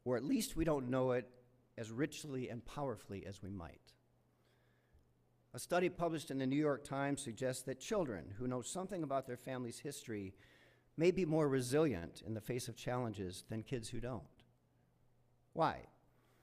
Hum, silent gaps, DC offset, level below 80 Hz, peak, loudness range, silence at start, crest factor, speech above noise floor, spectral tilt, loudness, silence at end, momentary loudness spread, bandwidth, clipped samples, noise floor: none; none; under 0.1%; -64 dBFS; -20 dBFS; 8 LU; 0.05 s; 20 dB; 35 dB; -5.5 dB/octave; -40 LUFS; 0.55 s; 14 LU; 15.5 kHz; under 0.1%; -74 dBFS